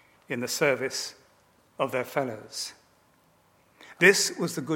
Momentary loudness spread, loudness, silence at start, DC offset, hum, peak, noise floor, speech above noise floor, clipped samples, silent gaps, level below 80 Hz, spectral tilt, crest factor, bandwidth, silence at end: 16 LU; -26 LUFS; 0.3 s; under 0.1%; none; -4 dBFS; -63 dBFS; 37 dB; under 0.1%; none; -78 dBFS; -3 dB/octave; 24 dB; 17.5 kHz; 0 s